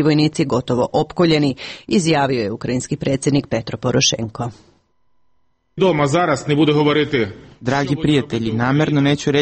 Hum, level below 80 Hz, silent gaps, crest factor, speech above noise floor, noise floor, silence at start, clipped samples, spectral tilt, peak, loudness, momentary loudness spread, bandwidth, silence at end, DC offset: none; -48 dBFS; none; 14 dB; 50 dB; -67 dBFS; 0 s; under 0.1%; -5 dB/octave; -4 dBFS; -18 LUFS; 8 LU; 8.8 kHz; 0 s; under 0.1%